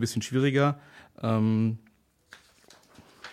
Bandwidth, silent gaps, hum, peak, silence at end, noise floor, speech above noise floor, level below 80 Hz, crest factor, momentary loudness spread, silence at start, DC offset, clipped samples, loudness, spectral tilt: 15 kHz; none; none; -10 dBFS; 0 s; -58 dBFS; 31 dB; -68 dBFS; 18 dB; 16 LU; 0 s; under 0.1%; under 0.1%; -26 LUFS; -6.5 dB/octave